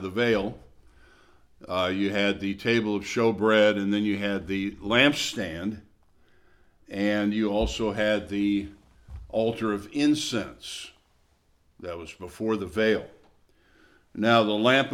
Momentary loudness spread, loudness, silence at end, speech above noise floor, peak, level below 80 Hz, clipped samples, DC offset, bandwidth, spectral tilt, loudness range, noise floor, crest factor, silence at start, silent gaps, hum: 17 LU; -25 LUFS; 0 s; 39 dB; -6 dBFS; -50 dBFS; under 0.1%; under 0.1%; 15 kHz; -5 dB/octave; 7 LU; -65 dBFS; 20 dB; 0 s; none; none